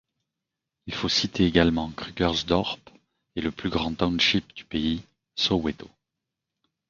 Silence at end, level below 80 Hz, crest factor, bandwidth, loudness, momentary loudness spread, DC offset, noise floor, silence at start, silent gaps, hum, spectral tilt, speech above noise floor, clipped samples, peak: 1 s; -46 dBFS; 24 dB; 7.4 kHz; -25 LUFS; 14 LU; under 0.1%; -86 dBFS; 0.85 s; none; none; -5 dB/octave; 60 dB; under 0.1%; -4 dBFS